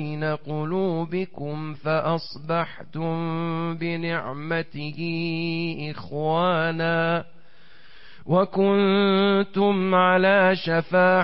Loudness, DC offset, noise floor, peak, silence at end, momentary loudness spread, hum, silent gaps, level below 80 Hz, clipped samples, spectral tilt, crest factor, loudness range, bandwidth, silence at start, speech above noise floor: -23 LUFS; 1%; -54 dBFS; -8 dBFS; 0 s; 11 LU; none; none; -62 dBFS; under 0.1%; -11 dB/octave; 14 dB; 7 LU; 5.8 kHz; 0 s; 31 dB